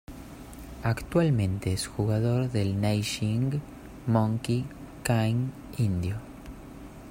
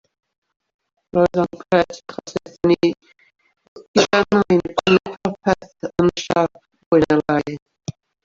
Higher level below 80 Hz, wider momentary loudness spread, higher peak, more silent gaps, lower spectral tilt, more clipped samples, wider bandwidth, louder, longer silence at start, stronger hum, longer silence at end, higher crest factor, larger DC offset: about the same, -48 dBFS vs -52 dBFS; first, 19 LU vs 15 LU; second, -8 dBFS vs 0 dBFS; second, none vs 3.68-3.76 s, 3.88-3.94 s, 6.86-6.91 s, 7.62-7.66 s; about the same, -6.5 dB/octave vs -5.5 dB/octave; neither; first, 16 kHz vs 7.6 kHz; second, -28 LUFS vs -19 LUFS; second, 0.1 s vs 1.15 s; neither; second, 0 s vs 0.35 s; about the same, 20 dB vs 20 dB; neither